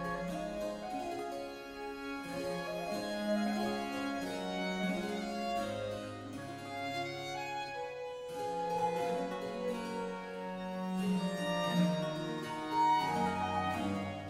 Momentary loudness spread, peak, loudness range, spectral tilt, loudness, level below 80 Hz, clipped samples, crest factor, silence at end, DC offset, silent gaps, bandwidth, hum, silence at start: 10 LU; -20 dBFS; 6 LU; -5.5 dB/octave; -37 LUFS; -64 dBFS; under 0.1%; 16 dB; 0 s; under 0.1%; none; 16 kHz; none; 0 s